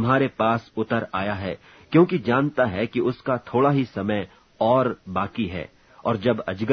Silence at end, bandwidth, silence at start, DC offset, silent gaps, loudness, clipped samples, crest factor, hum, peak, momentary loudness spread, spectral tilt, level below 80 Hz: 0 s; 6.4 kHz; 0 s; under 0.1%; none; -23 LUFS; under 0.1%; 18 dB; none; -4 dBFS; 10 LU; -8.5 dB/octave; -56 dBFS